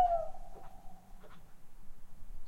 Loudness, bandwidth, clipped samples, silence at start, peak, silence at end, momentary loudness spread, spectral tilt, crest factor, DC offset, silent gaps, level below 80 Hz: -36 LUFS; 8.4 kHz; under 0.1%; 0 s; -18 dBFS; 0 s; 25 LU; -6 dB/octave; 20 dB; under 0.1%; none; -48 dBFS